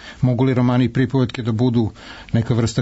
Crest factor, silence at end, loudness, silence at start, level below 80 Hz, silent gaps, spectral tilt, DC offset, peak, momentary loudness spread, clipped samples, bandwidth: 12 dB; 0 s; -19 LUFS; 0 s; -44 dBFS; none; -7.5 dB/octave; under 0.1%; -6 dBFS; 6 LU; under 0.1%; 8 kHz